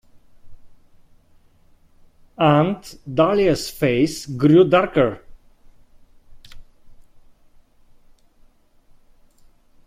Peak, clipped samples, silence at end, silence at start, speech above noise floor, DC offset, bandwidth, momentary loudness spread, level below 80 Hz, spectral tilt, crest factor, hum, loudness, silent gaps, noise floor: -2 dBFS; under 0.1%; 2.85 s; 0.45 s; 36 dB; under 0.1%; 16 kHz; 9 LU; -48 dBFS; -6.5 dB/octave; 20 dB; none; -18 LUFS; none; -53 dBFS